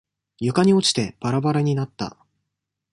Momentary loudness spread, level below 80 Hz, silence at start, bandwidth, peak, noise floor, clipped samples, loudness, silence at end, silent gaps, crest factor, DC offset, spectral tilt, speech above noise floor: 13 LU; -58 dBFS; 0.4 s; 11.5 kHz; -4 dBFS; -81 dBFS; under 0.1%; -21 LUFS; 0.85 s; none; 18 dB; under 0.1%; -5.5 dB/octave; 60 dB